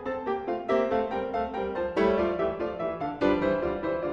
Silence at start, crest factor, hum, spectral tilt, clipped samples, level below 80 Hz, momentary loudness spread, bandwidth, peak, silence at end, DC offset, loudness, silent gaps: 0 s; 18 dB; none; -7.5 dB/octave; under 0.1%; -50 dBFS; 6 LU; 7.4 kHz; -10 dBFS; 0 s; under 0.1%; -28 LUFS; none